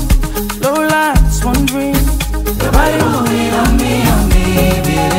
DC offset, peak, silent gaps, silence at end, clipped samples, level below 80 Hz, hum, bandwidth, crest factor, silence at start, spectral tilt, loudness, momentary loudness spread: under 0.1%; 0 dBFS; none; 0 s; under 0.1%; -16 dBFS; none; 16.5 kHz; 12 dB; 0 s; -5 dB/octave; -13 LUFS; 5 LU